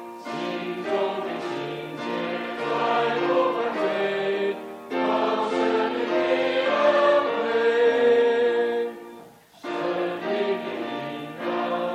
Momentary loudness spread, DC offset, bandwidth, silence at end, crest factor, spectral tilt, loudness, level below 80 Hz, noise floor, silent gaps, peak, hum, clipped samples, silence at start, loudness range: 12 LU; under 0.1%; 10.5 kHz; 0 s; 14 dB; -5 dB/octave; -24 LUFS; -72 dBFS; -47 dBFS; none; -10 dBFS; none; under 0.1%; 0 s; 6 LU